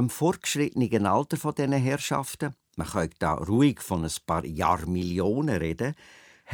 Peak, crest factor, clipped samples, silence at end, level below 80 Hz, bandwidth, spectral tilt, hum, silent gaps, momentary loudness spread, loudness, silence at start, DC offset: -8 dBFS; 18 dB; under 0.1%; 0 s; -48 dBFS; 19.5 kHz; -5.5 dB/octave; none; none; 8 LU; -27 LUFS; 0 s; under 0.1%